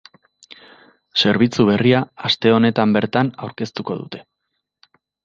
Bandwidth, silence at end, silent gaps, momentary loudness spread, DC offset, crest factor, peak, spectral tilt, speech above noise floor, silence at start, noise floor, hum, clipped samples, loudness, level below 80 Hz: 7.6 kHz; 1.05 s; none; 13 LU; under 0.1%; 18 dB; -2 dBFS; -6.5 dB/octave; 59 dB; 1.15 s; -76 dBFS; none; under 0.1%; -18 LUFS; -58 dBFS